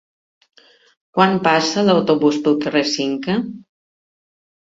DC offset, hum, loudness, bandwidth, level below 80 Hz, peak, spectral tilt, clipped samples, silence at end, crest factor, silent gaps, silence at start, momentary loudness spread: under 0.1%; none; -17 LUFS; 7.8 kHz; -60 dBFS; -2 dBFS; -5 dB/octave; under 0.1%; 1.05 s; 18 dB; none; 1.15 s; 8 LU